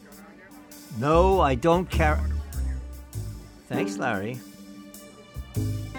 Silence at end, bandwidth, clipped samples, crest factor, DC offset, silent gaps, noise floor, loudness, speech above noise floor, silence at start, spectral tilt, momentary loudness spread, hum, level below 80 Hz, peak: 0 s; 19.5 kHz; under 0.1%; 20 dB; under 0.1%; none; -47 dBFS; -25 LUFS; 25 dB; 0 s; -6.5 dB/octave; 24 LU; none; -34 dBFS; -6 dBFS